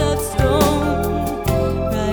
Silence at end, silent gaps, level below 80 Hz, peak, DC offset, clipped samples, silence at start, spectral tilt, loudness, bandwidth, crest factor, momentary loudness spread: 0 s; none; -28 dBFS; -2 dBFS; under 0.1%; under 0.1%; 0 s; -6 dB/octave; -19 LUFS; over 20 kHz; 16 dB; 5 LU